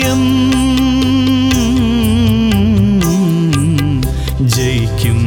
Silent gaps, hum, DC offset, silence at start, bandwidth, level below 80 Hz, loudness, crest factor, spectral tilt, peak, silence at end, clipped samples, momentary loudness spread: none; none; under 0.1%; 0 s; 20 kHz; -24 dBFS; -12 LUFS; 10 dB; -6 dB/octave; -2 dBFS; 0 s; under 0.1%; 3 LU